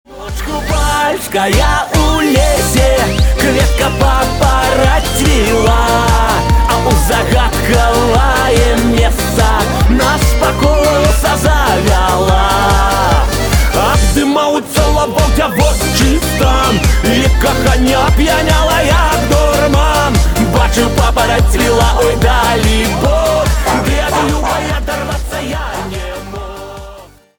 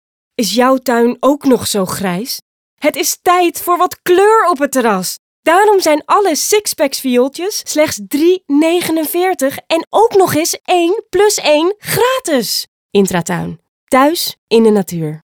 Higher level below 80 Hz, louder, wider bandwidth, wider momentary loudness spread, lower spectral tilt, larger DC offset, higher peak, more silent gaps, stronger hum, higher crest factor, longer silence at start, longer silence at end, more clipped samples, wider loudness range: first, -16 dBFS vs -54 dBFS; about the same, -11 LUFS vs -13 LUFS; about the same, over 20 kHz vs over 20 kHz; second, 5 LU vs 8 LU; about the same, -4.5 dB/octave vs -3.5 dB/octave; neither; about the same, 0 dBFS vs 0 dBFS; second, none vs 2.42-2.77 s, 5.19-5.43 s, 9.87-9.91 s, 12.68-12.89 s, 13.68-13.87 s, 14.38-14.47 s; neither; about the same, 10 dB vs 12 dB; second, 0.1 s vs 0.4 s; first, 0.35 s vs 0.1 s; neither; about the same, 2 LU vs 2 LU